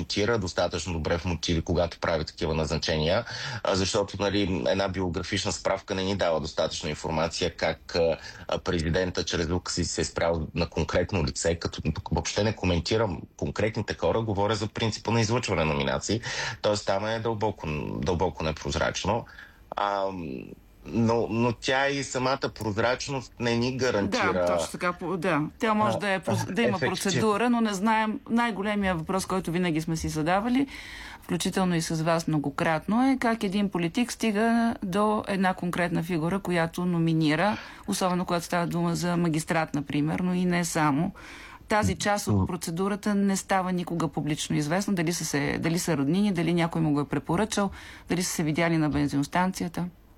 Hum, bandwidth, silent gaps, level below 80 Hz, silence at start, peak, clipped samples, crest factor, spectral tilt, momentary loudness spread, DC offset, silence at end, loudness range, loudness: none; 16.5 kHz; none; -46 dBFS; 0 s; -14 dBFS; under 0.1%; 14 dB; -5 dB/octave; 6 LU; under 0.1%; 0.25 s; 2 LU; -27 LUFS